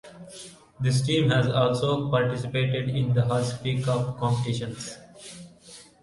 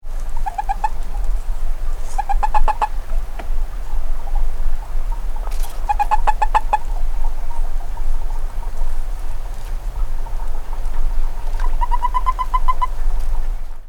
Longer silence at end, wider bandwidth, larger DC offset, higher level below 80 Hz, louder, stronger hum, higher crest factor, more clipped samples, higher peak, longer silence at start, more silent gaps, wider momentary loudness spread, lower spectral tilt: first, 0.2 s vs 0 s; first, 11.5 kHz vs 4.6 kHz; neither; second, -56 dBFS vs -18 dBFS; about the same, -25 LUFS vs -25 LUFS; neither; about the same, 18 dB vs 14 dB; neither; second, -8 dBFS vs 0 dBFS; about the same, 0.05 s vs 0.05 s; neither; first, 21 LU vs 10 LU; about the same, -6 dB/octave vs -5 dB/octave